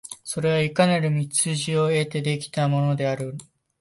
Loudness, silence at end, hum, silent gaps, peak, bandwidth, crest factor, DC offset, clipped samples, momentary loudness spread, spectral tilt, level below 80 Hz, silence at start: -23 LUFS; 0.4 s; none; none; -4 dBFS; 11.5 kHz; 18 dB; under 0.1%; under 0.1%; 9 LU; -5 dB/octave; -62 dBFS; 0.05 s